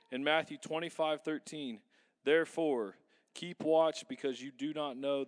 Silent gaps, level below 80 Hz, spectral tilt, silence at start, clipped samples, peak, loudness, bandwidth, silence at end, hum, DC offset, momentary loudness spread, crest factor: none; under -90 dBFS; -4 dB/octave; 0.1 s; under 0.1%; -16 dBFS; -35 LUFS; 11 kHz; 0 s; none; under 0.1%; 14 LU; 20 dB